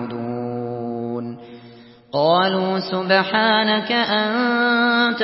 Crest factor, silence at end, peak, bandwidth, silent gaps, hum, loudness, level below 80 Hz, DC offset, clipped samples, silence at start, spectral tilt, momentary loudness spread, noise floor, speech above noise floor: 16 dB; 0 s; -4 dBFS; 5.8 kHz; none; none; -19 LUFS; -68 dBFS; under 0.1%; under 0.1%; 0 s; -9.5 dB/octave; 11 LU; -44 dBFS; 26 dB